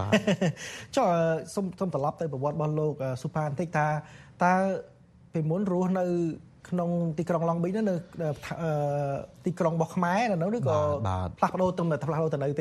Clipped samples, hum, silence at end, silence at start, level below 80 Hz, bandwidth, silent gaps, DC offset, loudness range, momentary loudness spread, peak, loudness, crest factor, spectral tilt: under 0.1%; none; 0 s; 0 s; -60 dBFS; 12.5 kHz; none; under 0.1%; 2 LU; 8 LU; -8 dBFS; -28 LUFS; 20 dB; -7 dB/octave